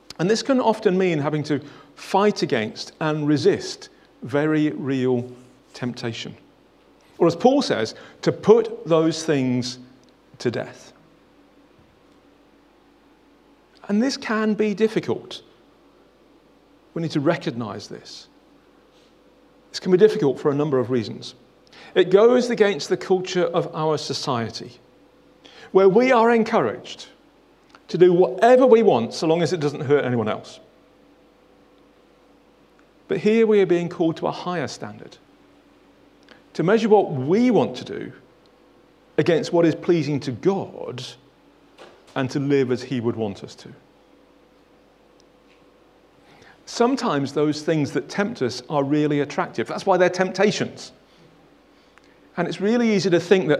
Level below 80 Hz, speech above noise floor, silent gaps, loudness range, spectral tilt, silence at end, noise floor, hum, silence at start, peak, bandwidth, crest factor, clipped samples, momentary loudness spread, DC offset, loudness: -66 dBFS; 35 dB; none; 10 LU; -6 dB/octave; 0 s; -55 dBFS; none; 0.2 s; 0 dBFS; 11.5 kHz; 22 dB; under 0.1%; 18 LU; under 0.1%; -21 LUFS